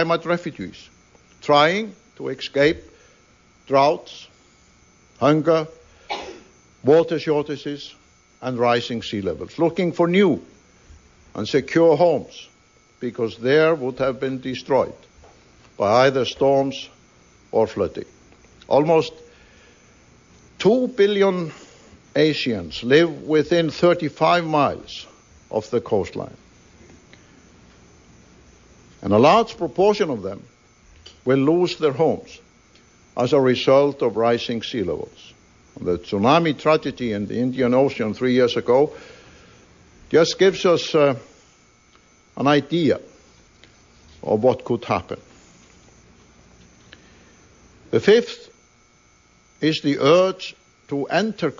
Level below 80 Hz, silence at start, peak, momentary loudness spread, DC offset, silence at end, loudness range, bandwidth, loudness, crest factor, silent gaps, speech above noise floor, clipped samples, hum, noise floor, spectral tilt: -58 dBFS; 0 s; -2 dBFS; 16 LU; under 0.1%; 0.05 s; 5 LU; 7.6 kHz; -20 LUFS; 18 dB; none; 37 dB; under 0.1%; none; -56 dBFS; -6 dB/octave